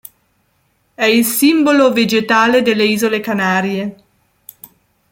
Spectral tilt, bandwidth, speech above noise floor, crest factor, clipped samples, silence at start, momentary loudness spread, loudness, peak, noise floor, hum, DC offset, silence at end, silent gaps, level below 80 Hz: -4 dB/octave; 17 kHz; 48 dB; 14 dB; under 0.1%; 1 s; 6 LU; -13 LUFS; -2 dBFS; -61 dBFS; none; under 0.1%; 1.15 s; none; -60 dBFS